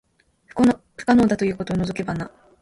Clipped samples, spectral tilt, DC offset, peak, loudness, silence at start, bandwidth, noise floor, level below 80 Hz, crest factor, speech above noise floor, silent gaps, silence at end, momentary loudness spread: under 0.1%; -7 dB/octave; under 0.1%; -4 dBFS; -21 LUFS; 0.55 s; 11.5 kHz; -53 dBFS; -48 dBFS; 18 dB; 33 dB; none; 0.35 s; 13 LU